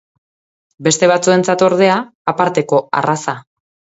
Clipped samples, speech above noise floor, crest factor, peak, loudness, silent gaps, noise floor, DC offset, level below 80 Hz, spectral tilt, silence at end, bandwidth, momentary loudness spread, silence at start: under 0.1%; over 76 dB; 16 dB; 0 dBFS; -14 LUFS; 2.15-2.25 s; under -90 dBFS; under 0.1%; -60 dBFS; -4.5 dB/octave; 0.55 s; 8 kHz; 9 LU; 0.8 s